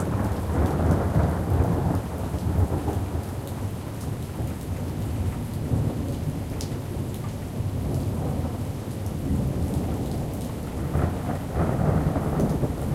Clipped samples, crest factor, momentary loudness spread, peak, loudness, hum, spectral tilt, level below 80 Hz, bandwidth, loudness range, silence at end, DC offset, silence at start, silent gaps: under 0.1%; 16 dB; 8 LU; -10 dBFS; -27 LUFS; none; -7.5 dB/octave; -34 dBFS; 16 kHz; 4 LU; 0 s; under 0.1%; 0 s; none